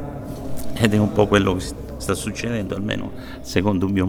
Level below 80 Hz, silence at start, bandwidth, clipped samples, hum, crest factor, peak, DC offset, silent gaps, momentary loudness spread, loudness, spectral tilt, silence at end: -38 dBFS; 0 s; 19 kHz; under 0.1%; none; 20 dB; 0 dBFS; under 0.1%; none; 15 LU; -22 LUFS; -6 dB/octave; 0 s